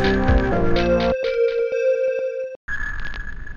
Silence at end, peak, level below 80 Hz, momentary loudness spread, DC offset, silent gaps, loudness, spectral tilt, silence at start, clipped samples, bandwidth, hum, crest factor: 0 s; -6 dBFS; -28 dBFS; 11 LU; under 0.1%; 2.56-2.68 s; -21 LUFS; -7 dB/octave; 0 s; under 0.1%; 7 kHz; none; 14 dB